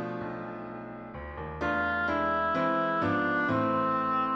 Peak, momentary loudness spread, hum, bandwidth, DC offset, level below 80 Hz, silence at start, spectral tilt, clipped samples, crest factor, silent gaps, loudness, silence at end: -14 dBFS; 13 LU; none; 7.8 kHz; under 0.1%; -52 dBFS; 0 s; -7.5 dB/octave; under 0.1%; 14 dB; none; -29 LUFS; 0 s